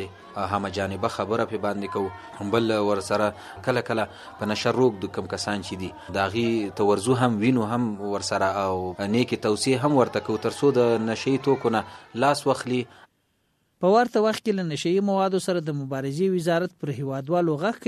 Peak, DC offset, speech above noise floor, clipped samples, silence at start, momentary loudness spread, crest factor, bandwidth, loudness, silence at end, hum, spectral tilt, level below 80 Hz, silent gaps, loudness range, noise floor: -6 dBFS; under 0.1%; 46 dB; under 0.1%; 0 s; 9 LU; 20 dB; 13.5 kHz; -25 LUFS; 0.1 s; none; -5.5 dB/octave; -62 dBFS; none; 3 LU; -70 dBFS